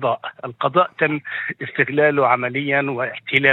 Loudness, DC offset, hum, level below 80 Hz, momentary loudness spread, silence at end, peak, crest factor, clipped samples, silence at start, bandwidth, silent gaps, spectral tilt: -19 LUFS; under 0.1%; none; -66 dBFS; 9 LU; 0 s; 0 dBFS; 20 dB; under 0.1%; 0 s; 4.2 kHz; none; -7.5 dB/octave